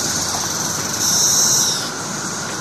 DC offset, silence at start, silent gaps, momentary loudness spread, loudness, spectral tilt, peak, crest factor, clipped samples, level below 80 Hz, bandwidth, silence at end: 0.2%; 0 s; none; 11 LU; -16 LUFS; -1 dB/octave; -2 dBFS; 16 dB; under 0.1%; -54 dBFS; 13.5 kHz; 0 s